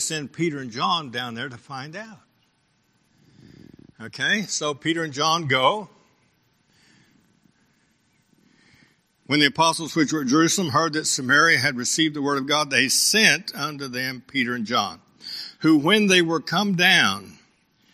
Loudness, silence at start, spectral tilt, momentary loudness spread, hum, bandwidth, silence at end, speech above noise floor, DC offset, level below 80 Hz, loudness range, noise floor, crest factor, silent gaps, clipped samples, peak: -20 LUFS; 0 s; -3 dB/octave; 17 LU; none; 15 kHz; 0.6 s; 44 dB; under 0.1%; -68 dBFS; 11 LU; -66 dBFS; 24 dB; none; under 0.1%; 0 dBFS